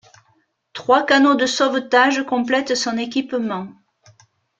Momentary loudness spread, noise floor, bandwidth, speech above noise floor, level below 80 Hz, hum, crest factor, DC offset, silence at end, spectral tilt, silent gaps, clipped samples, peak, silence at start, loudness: 14 LU; -63 dBFS; 9 kHz; 45 dB; -66 dBFS; none; 18 dB; under 0.1%; 0.9 s; -3 dB/octave; none; under 0.1%; -2 dBFS; 0.75 s; -18 LUFS